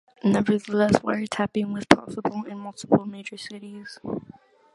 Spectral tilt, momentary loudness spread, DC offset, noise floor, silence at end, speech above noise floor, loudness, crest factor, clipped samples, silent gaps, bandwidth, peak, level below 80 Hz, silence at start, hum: -6 dB/octave; 17 LU; under 0.1%; -50 dBFS; 0.55 s; 26 dB; -24 LUFS; 26 dB; under 0.1%; none; 11.5 kHz; 0 dBFS; -56 dBFS; 0.25 s; none